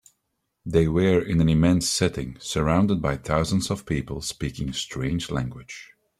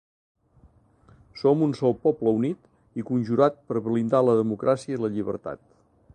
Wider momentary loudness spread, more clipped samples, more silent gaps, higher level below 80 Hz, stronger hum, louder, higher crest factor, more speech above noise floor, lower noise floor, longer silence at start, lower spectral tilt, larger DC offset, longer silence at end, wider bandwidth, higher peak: about the same, 12 LU vs 14 LU; neither; neither; first, -42 dBFS vs -62 dBFS; neither; about the same, -24 LUFS vs -24 LUFS; about the same, 18 dB vs 20 dB; first, 54 dB vs 34 dB; first, -77 dBFS vs -58 dBFS; second, 0.65 s vs 1.35 s; second, -5.5 dB/octave vs -8.5 dB/octave; neither; second, 0.35 s vs 0.6 s; first, 14.5 kHz vs 9.6 kHz; about the same, -6 dBFS vs -6 dBFS